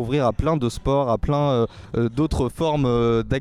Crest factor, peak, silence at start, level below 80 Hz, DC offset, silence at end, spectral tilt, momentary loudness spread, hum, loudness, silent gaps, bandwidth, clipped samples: 12 dB; -8 dBFS; 0 s; -34 dBFS; under 0.1%; 0 s; -7.5 dB/octave; 3 LU; none; -22 LUFS; none; 13.5 kHz; under 0.1%